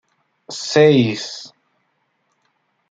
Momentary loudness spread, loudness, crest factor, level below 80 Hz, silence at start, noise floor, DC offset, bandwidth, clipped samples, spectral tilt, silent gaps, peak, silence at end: 21 LU; -16 LUFS; 18 dB; -62 dBFS; 0.5 s; -68 dBFS; under 0.1%; 9 kHz; under 0.1%; -5.5 dB/octave; none; -2 dBFS; 1.45 s